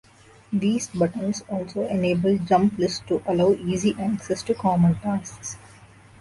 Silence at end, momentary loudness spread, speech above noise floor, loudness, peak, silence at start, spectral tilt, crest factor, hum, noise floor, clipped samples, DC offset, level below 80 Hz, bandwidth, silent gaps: 0.55 s; 9 LU; 26 dB; -23 LUFS; -8 dBFS; 0.5 s; -6.5 dB/octave; 16 dB; none; -49 dBFS; under 0.1%; under 0.1%; -52 dBFS; 11.5 kHz; none